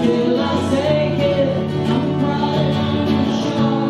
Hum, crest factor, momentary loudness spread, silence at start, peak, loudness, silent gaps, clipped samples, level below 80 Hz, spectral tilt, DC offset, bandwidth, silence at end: none; 14 dB; 2 LU; 0 s; -2 dBFS; -18 LUFS; none; under 0.1%; -48 dBFS; -7 dB/octave; under 0.1%; 11.5 kHz; 0 s